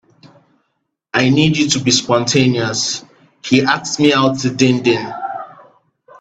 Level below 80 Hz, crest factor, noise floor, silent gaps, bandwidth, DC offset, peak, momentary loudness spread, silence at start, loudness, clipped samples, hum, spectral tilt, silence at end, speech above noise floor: -52 dBFS; 16 dB; -71 dBFS; none; 9 kHz; under 0.1%; 0 dBFS; 13 LU; 1.15 s; -15 LUFS; under 0.1%; none; -4 dB/octave; 0.7 s; 56 dB